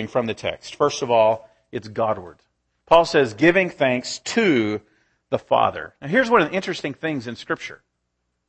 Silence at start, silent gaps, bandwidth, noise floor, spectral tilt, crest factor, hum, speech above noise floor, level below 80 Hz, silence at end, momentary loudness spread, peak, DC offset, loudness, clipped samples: 0 s; none; 8.8 kHz; -75 dBFS; -5 dB/octave; 22 dB; none; 54 dB; -56 dBFS; 0.75 s; 13 LU; 0 dBFS; under 0.1%; -21 LUFS; under 0.1%